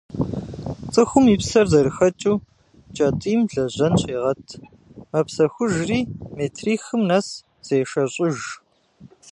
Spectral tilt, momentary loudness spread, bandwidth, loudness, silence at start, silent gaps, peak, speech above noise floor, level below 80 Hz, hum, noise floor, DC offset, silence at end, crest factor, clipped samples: -6 dB/octave; 16 LU; 11.5 kHz; -21 LUFS; 0.1 s; none; -2 dBFS; 30 dB; -46 dBFS; none; -50 dBFS; under 0.1%; 0 s; 20 dB; under 0.1%